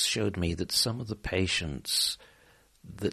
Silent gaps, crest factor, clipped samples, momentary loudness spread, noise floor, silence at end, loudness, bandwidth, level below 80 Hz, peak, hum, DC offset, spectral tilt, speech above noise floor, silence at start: none; 18 dB; under 0.1%; 8 LU; -61 dBFS; 0 s; -29 LUFS; 13.5 kHz; -48 dBFS; -14 dBFS; none; under 0.1%; -3 dB/octave; 31 dB; 0 s